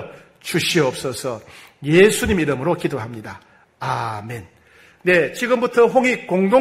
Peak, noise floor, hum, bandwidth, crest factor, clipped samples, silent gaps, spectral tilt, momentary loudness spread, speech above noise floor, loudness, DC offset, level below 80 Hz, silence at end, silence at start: -2 dBFS; -50 dBFS; none; 16 kHz; 18 dB; under 0.1%; none; -5 dB/octave; 19 LU; 32 dB; -18 LUFS; under 0.1%; -46 dBFS; 0 s; 0 s